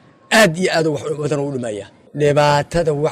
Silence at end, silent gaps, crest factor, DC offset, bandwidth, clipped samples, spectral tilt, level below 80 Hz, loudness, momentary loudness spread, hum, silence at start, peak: 0 s; none; 14 dB; under 0.1%; 16 kHz; under 0.1%; -5 dB/octave; -44 dBFS; -17 LUFS; 13 LU; none; 0.3 s; -4 dBFS